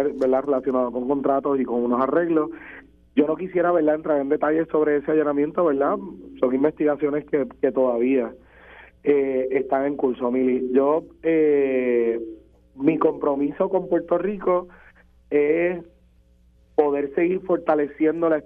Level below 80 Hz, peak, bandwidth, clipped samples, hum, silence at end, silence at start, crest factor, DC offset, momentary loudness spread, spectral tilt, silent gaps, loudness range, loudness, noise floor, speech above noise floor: -56 dBFS; -4 dBFS; 3.7 kHz; under 0.1%; none; 0.05 s; 0 s; 18 dB; under 0.1%; 5 LU; -9.5 dB/octave; none; 3 LU; -22 LUFS; -56 dBFS; 35 dB